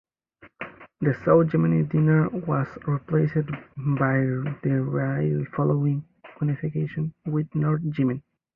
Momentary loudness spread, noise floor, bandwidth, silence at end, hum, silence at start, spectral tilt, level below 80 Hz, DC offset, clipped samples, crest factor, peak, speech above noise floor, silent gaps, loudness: 10 LU; -55 dBFS; 3.2 kHz; 0.35 s; none; 0.45 s; -12 dB/octave; -58 dBFS; under 0.1%; under 0.1%; 18 dB; -6 dBFS; 32 dB; none; -24 LUFS